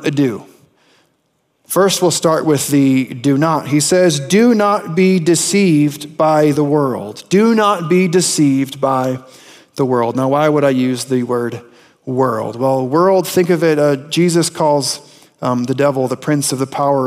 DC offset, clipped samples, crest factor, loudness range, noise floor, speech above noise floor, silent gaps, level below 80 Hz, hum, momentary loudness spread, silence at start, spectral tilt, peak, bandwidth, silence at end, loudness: under 0.1%; under 0.1%; 12 dB; 3 LU; -64 dBFS; 50 dB; none; -64 dBFS; none; 8 LU; 0 s; -5 dB/octave; -2 dBFS; 16 kHz; 0 s; -14 LUFS